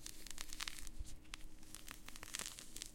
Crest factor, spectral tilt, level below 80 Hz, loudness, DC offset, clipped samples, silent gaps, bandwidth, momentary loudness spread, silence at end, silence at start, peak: 28 dB; -1 dB/octave; -56 dBFS; -50 LUFS; under 0.1%; under 0.1%; none; 17 kHz; 9 LU; 0 s; 0 s; -20 dBFS